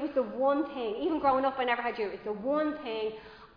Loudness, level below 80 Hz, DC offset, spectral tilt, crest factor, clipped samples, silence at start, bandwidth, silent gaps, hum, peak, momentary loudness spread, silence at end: -31 LUFS; -64 dBFS; under 0.1%; -7.5 dB/octave; 16 dB; under 0.1%; 0 s; 5.2 kHz; none; none; -14 dBFS; 8 LU; 0.1 s